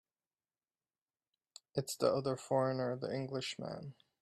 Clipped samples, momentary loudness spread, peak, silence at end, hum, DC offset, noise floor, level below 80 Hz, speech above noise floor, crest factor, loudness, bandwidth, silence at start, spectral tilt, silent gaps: under 0.1%; 11 LU; -18 dBFS; 0.3 s; none; under 0.1%; under -90 dBFS; -78 dBFS; over 53 dB; 22 dB; -37 LUFS; 13 kHz; 1.75 s; -5.5 dB/octave; none